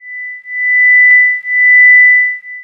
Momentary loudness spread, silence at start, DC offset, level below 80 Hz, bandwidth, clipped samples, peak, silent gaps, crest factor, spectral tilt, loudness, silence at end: 17 LU; 0.05 s; under 0.1%; -78 dBFS; 2.9 kHz; under 0.1%; 0 dBFS; none; 8 dB; 0.5 dB/octave; -5 LUFS; 0 s